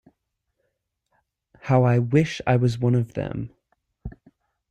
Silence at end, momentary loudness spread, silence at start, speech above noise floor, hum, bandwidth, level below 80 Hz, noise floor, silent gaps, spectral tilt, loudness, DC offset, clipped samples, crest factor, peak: 0.6 s; 22 LU; 1.65 s; 56 dB; none; 8.8 kHz; -52 dBFS; -77 dBFS; none; -8 dB/octave; -22 LUFS; under 0.1%; under 0.1%; 18 dB; -6 dBFS